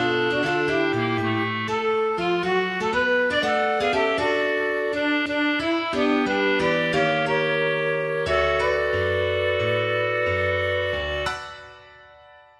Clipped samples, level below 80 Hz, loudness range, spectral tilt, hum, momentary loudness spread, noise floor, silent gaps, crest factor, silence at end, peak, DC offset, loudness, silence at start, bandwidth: under 0.1%; -48 dBFS; 1 LU; -5.5 dB/octave; none; 3 LU; -49 dBFS; none; 14 dB; 0.55 s; -8 dBFS; under 0.1%; -22 LUFS; 0 s; 12.5 kHz